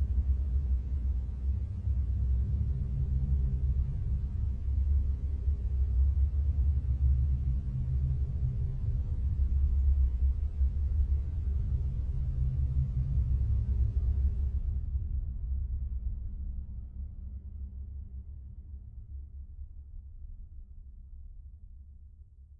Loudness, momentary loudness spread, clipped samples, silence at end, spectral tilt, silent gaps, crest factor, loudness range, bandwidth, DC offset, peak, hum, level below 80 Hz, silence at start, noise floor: -32 LUFS; 19 LU; under 0.1%; 0.05 s; -11 dB/octave; none; 14 dB; 16 LU; 1.3 kHz; under 0.1%; -18 dBFS; none; -32 dBFS; 0 s; -52 dBFS